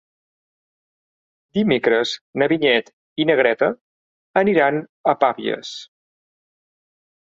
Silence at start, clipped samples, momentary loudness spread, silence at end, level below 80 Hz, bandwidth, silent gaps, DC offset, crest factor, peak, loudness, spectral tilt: 1.55 s; under 0.1%; 11 LU; 1.4 s; -62 dBFS; 7.8 kHz; 2.21-2.33 s, 2.93-3.16 s, 3.81-4.34 s, 4.89-5.04 s; under 0.1%; 20 dB; -2 dBFS; -19 LUFS; -5.5 dB/octave